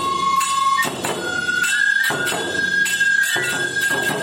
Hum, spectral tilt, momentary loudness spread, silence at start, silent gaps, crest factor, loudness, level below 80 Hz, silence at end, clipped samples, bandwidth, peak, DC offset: none; -1.5 dB/octave; 5 LU; 0 s; none; 12 dB; -18 LUFS; -58 dBFS; 0 s; under 0.1%; 16.5 kHz; -8 dBFS; under 0.1%